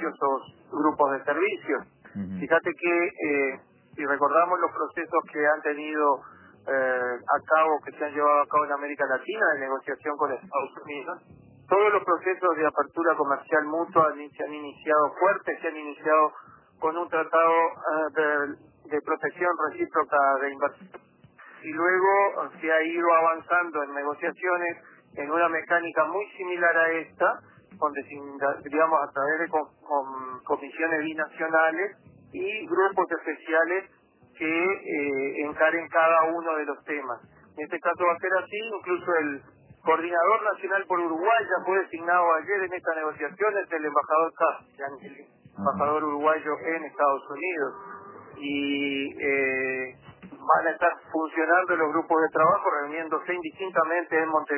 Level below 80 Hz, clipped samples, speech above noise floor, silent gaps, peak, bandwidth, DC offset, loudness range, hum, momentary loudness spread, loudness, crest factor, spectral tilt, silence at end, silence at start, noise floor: -72 dBFS; under 0.1%; 26 dB; none; -6 dBFS; 3.2 kHz; under 0.1%; 3 LU; none; 11 LU; -26 LUFS; 20 dB; -8.5 dB/octave; 0 s; 0 s; -52 dBFS